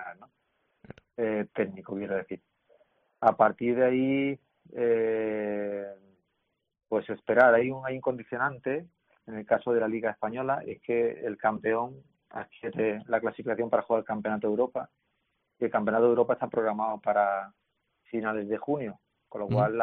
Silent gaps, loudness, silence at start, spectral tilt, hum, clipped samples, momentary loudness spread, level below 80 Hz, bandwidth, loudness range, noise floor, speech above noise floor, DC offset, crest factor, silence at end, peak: none; -28 LUFS; 0 s; -2 dB/octave; none; under 0.1%; 14 LU; -70 dBFS; 3.9 kHz; 3 LU; -79 dBFS; 51 dB; under 0.1%; 22 dB; 0 s; -8 dBFS